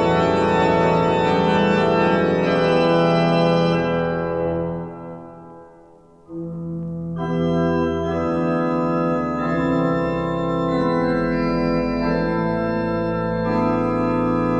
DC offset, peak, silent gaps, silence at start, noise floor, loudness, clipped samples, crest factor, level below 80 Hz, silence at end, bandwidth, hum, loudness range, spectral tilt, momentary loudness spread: 0.1%; -6 dBFS; none; 0 s; -48 dBFS; -20 LUFS; under 0.1%; 14 dB; -42 dBFS; 0 s; 8.4 kHz; none; 8 LU; -7.5 dB/octave; 11 LU